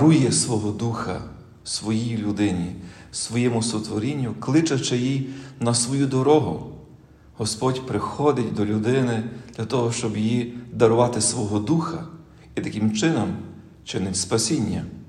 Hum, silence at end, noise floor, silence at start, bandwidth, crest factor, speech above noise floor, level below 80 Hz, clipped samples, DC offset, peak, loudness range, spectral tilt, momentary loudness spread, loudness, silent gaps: none; 0.05 s; -48 dBFS; 0 s; 12.5 kHz; 20 dB; 26 dB; -54 dBFS; under 0.1%; under 0.1%; -2 dBFS; 3 LU; -5 dB/octave; 14 LU; -23 LUFS; none